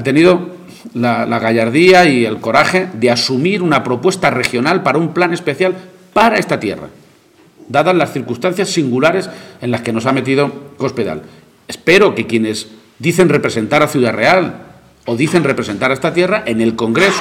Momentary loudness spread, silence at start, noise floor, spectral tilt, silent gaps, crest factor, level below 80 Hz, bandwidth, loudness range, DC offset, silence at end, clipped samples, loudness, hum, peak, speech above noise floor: 12 LU; 0 s; -47 dBFS; -5 dB/octave; none; 14 dB; -52 dBFS; 16 kHz; 5 LU; under 0.1%; 0 s; under 0.1%; -13 LUFS; none; 0 dBFS; 34 dB